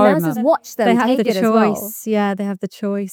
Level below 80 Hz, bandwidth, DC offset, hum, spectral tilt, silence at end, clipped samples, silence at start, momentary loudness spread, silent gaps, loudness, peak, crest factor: -68 dBFS; 20 kHz; under 0.1%; none; -6 dB/octave; 0 s; under 0.1%; 0 s; 9 LU; none; -17 LUFS; 0 dBFS; 16 dB